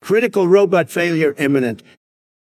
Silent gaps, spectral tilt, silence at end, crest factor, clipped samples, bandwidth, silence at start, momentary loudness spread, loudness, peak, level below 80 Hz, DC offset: none; -6 dB/octave; 0.7 s; 14 dB; under 0.1%; 16 kHz; 0.05 s; 7 LU; -16 LUFS; -2 dBFS; -64 dBFS; under 0.1%